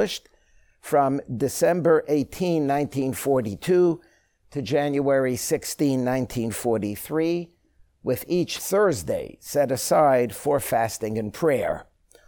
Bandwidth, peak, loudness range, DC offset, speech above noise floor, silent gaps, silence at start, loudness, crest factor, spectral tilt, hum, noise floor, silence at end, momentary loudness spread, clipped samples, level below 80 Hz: over 20 kHz; -8 dBFS; 3 LU; under 0.1%; 36 dB; none; 0 s; -24 LUFS; 16 dB; -5.5 dB/octave; none; -59 dBFS; 0.45 s; 9 LU; under 0.1%; -54 dBFS